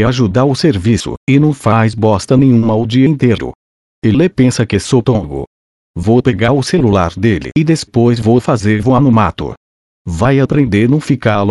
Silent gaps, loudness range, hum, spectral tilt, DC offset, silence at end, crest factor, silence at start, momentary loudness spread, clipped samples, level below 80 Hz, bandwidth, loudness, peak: 1.17-1.27 s, 3.55-4.02 s, 5.47-5.94 s, 9.57-10.05 s; 2 LU; none; -7 dB/octave; under 0.1%; 0 s; 12 dB; 0 s; 8 LU; under 0.1%; -38 dBFS; 11.5 kHz; -12 LUFS; 0 dBFS